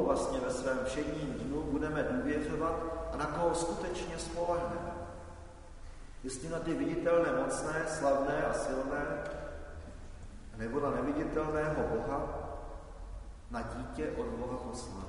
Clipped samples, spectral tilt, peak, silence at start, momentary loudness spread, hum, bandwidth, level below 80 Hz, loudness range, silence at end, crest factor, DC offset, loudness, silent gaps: under 0.1%; -5.5 dB/octave; -16 dBFS; 0 s; 18 LU; none; 11 kHz; -48 dBFS; 5 LU; 0 s; 18 dB; under 0.1%; -35 LUFS; none